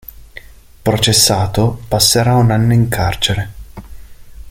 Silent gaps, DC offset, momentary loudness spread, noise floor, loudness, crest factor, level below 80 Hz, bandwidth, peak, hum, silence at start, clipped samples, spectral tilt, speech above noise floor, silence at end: none; under 0.1%; 11 LU; -37 dBFS; -13 LUFS; 14 dB; -34 dBFS; 17 kHz; 0 dBFS; none; 0.2 s; under 0.1%; -4 dB/octave; 24 dB; 0 s